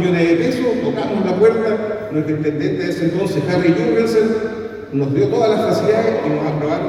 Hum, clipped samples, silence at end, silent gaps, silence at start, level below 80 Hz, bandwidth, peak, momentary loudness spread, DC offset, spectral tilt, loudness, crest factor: none; under 0.1%; 0 s; none; 0 s; -50 dBFS; 13.5 kHz; -2 dBFS; 7 LU; under 0.1%; -7 dB/octave; -17 LUFS; 14 dB